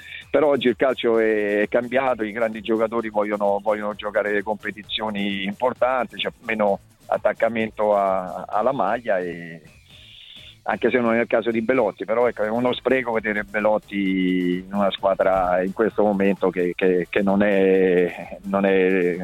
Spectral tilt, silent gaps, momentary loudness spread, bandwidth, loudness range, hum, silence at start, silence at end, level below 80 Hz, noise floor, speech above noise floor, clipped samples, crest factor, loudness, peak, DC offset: -7 dB/octave; none; 7 LU; 13.5 kHz; 4 LU; none; 0 s; 0 s; -54 dBFS; -46 dBFS; 25 dB; under 0.1%; 16 dB; -21 LUFS; -6 dBFS; under 0.1%